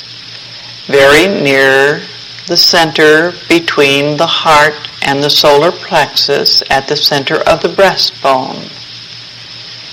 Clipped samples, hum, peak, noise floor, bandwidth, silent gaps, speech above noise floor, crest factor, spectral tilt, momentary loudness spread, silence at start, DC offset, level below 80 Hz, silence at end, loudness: 0.2%; none; 0 dBFS; -29 dBFS; 17 kHz; none; 20 dB; 10 dB; -3 dB/octave; 19 LU; 0 s; under 0.1%; -42 dBFS; 0 s; -8 LUFS